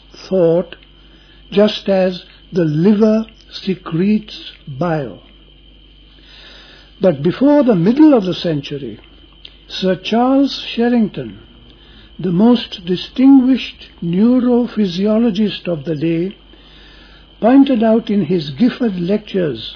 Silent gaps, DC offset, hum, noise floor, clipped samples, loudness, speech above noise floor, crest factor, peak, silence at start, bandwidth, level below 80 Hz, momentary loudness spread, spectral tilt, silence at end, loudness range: none; under 0.1%; none; -44 dBFS; under 0.1%; -15 LUFS; 30 dB; 14 dB; -2 dBFS; 0.15 s; 5.4 kHz; -46 dBFS; 15 LU; -8 dB/octave; 0 s; 5 LU